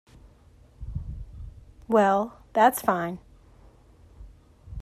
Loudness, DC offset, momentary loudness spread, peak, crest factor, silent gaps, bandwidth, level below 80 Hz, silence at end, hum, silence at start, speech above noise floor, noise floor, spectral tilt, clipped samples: -24 LUFS; under 0.1%; 24 LU; -6 dBFS; 22 dB; none; 15 kHz; -46 dBFS; 0 s; none; 0.8 s; 32 dB; -55 dBFS; -5.5 dB/octave; under 0.1%